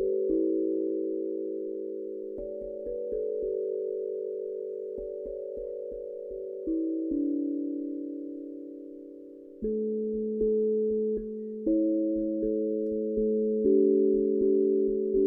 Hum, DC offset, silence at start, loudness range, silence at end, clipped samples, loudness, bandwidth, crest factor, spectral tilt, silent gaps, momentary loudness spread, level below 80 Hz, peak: none; under 0.1%; 0 s; 8 LU; 0 s; under 0.1%; -30 LUFS; 1 kHz; 16 dB; -13.5 dB/octave; none; 13 LU; -56 dBFS; -14 dBFS